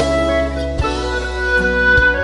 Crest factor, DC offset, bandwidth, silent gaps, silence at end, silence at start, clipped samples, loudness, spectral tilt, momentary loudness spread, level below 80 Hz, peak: 14 dB; under 0.1%; 11.5 kHz; none; 0 s; 0 s; under 0.1%; -16 LUFS; -5 dB/octave; 9 LU; -24 dBFS; -2 dBFS